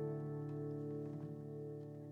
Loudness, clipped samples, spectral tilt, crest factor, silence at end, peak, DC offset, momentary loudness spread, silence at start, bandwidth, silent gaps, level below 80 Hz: -46 LUFS; under 0.1%; -11 dB/octave; 14 dB; 0 s; -32 dBFS; under 0.1%; 4 LU; 0 s; 3.2 kHz; none; -78 dBFS